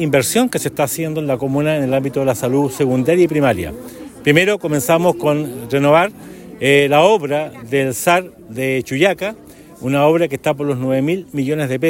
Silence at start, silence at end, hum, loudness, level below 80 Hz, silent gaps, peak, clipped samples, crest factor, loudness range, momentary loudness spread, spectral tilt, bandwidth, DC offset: 0 s; 0 s; none; -16 LUFS; -50 dBFS; none; 0 dBFS; under 0.1%; 16 dB; 3 LU; 9 LU; -5 dB/octave; 16.5 kHz; under 0.1%